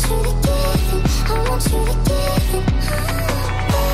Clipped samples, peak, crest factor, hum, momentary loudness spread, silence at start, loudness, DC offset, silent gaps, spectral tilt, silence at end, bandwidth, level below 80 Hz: under 0.1%; -8 dBFS; 10 dB; none; 2 LU; 0 s; -19 LUFS; under 0.1%; none; -5 dB/octave; 0 s; 15.5 kHz; -20 dBFS